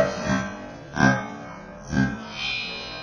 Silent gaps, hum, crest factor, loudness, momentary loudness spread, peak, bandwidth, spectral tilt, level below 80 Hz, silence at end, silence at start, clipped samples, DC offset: none; none; 22 dB; -25 LUFS; 17 LU; -4 dBFS; 10 kHz; -5 dB/octave; -46 dBFS; 0 s; 0 s; under 0.1%; under 0.1%